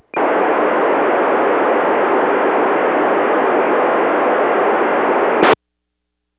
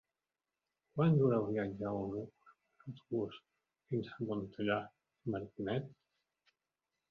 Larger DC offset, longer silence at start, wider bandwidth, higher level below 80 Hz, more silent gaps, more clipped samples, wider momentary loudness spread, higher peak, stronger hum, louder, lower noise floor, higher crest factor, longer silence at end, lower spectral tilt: neither; second, 0.15 s vs 0.95 s; second, 4 kHz vs 5.2 kHz; first, -60 dBFS vs -70 dBFS; neither; neither; second, 1 LU vs 21 LU; first, 0 dBFS vs -20 dBFS; neither; first, -15 LUFS vs -37 LUFS; second, -75 dBFS vs under -90 dBFS; second, 14 dB vs 20 dB; second, 0.85 s vs 1.15 s; first, -8.5 dB/octave vs -7 dB/octave